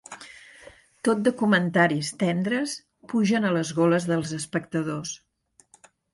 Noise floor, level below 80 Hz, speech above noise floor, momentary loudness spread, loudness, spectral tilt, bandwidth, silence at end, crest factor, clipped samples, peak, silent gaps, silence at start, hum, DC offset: -59 dBFS; -66 dBFS; 35 dB; 17 LU; -24 LUFS; -5.5 dB/octave; 11.5 kHz; 0.95 s; 18 dB; under 0.1%; -8 dBFS; none; 0.1 s; none; under 0.1%